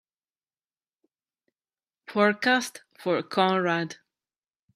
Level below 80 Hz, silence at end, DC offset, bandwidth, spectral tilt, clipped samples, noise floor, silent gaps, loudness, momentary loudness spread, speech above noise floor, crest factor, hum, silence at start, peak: -78 dBFS; 0.8 s; under 0.1%; 15 kHz; -4.5 dB/octave; under 0.1%; under -90 dBFS; none; -25 LUFS; 12 LU; over 65 dB; 22 dB; none; 2.1 s; -6 dBFS